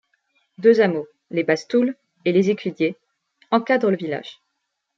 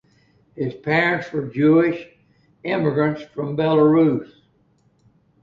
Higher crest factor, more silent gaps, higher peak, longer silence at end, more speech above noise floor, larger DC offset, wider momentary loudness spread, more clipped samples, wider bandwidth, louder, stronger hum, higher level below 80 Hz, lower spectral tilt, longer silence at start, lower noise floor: about the same, 18 dB vs 16 dB; neither; about the same, -4 dBFS vs -4 dBFS; second, 0.65 s vs 1.2 s; first, 57 dB vs 42 dB; neither; about the same, 11 LU vs 13 LU; neither; first, 7.6 kHz vs 6.4 kHz; about the same, -21 LUFS vs -20 LUFS; neither; second, -70 dBFS vs -60 dBFS; second, -6.5 dB/octave vs -8.5 dB/octave; about the same, 0.6 s vs 0.55 s; first, -77 dBFS vs -61 dBFS